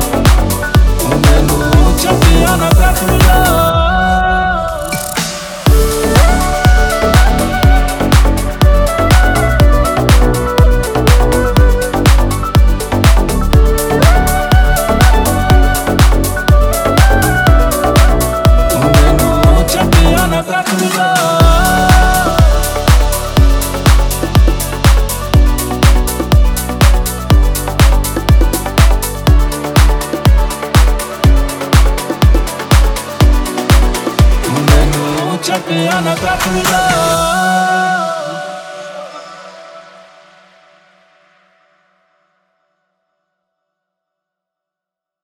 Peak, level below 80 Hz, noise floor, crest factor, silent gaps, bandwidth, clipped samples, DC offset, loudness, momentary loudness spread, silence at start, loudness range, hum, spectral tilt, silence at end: 0 dBFS; -12 dBFS; -84 dBFS; 10 dB; none; over 20 kHz; 0.2%; under 0.1%; -11 LUFS; 5 LU; 0 s; 3 LU; none; -5 dB/octave; 5.45 s